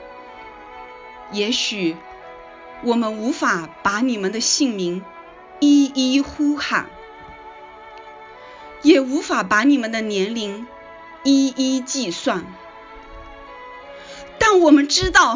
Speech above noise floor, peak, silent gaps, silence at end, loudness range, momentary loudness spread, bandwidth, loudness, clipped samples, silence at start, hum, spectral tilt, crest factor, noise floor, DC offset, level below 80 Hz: 22 dB; 0 dBFS; none; 0 s; 4 LU; 25 LU; 7.6 kHz; -18 LUFS; under 0.1%; 0 s; none; -3 dB/octave; 20 dB; -40 dBFS; under 0.1%; -46 dBFS